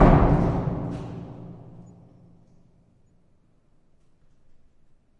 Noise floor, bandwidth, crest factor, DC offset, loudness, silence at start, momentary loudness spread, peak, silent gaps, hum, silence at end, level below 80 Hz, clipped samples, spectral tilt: -60 dBFS; 6.6 kHz; 22 dB; under 0.1%; -24 LUFS; 0 s; 27 LU; -2 dBFS; none; none; 3.6 s; -32 dBFS; under 0.1%; -10 dB/octave